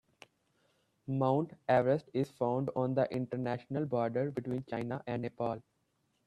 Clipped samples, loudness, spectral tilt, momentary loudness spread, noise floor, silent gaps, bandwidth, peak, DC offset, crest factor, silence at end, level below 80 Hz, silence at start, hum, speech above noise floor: under 0.1%; -34 LUFS; -9 dB/octave; 8 LU; -78 dBFS; none; 10 kHz; -16 dBFS; under 0.1%; 20 dB; 0.65 s; -72 dBFS; 1.05 s; none; 44 dB